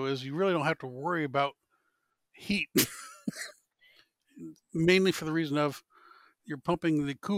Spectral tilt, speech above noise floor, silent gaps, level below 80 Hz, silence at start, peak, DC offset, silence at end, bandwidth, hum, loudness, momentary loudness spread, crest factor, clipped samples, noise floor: -4.5 dB/octave; 48 dB; none; -64 dBFS; 0 s; -12 dBFS; under 0.1%; 0 s; 16.5 kHz; none; -30 LUFS; 18 LU; 20 dB; under 0.1%; -78 dBFS